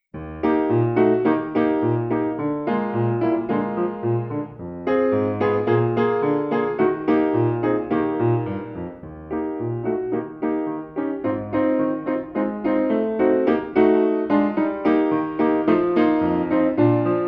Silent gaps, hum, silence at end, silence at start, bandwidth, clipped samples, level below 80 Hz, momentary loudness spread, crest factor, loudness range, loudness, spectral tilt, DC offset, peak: none; none; 0 s; 0.15 s; 5.2 kHz; under 0.1%; -54 dBFS; 9 LU; 16 dB; 5 LU; -21 LUFS; -10.5 dB/octave; under 0.1%; -4 dBFS